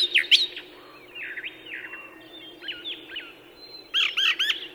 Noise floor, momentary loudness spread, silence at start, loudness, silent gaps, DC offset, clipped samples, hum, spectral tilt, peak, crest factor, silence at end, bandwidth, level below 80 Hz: -47 dBFS; 24 LU; 0 s; -23 LUFS; none; under 0.1%; under 0.1%; none; 1 dB/octave; -4 dBFS; 24 dB; 0 s; over 20 kHz; -70 dBFS